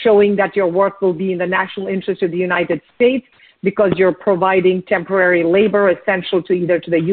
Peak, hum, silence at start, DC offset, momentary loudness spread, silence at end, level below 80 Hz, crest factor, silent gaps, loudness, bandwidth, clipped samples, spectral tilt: -2 dBFS; none; 0 s; under 0.1%; 7 LU; 0 s; -56 dBFS; 14 dB; none; -16 LUFS; 4.4 kHz; under 0.1%; -4.5 dB/octave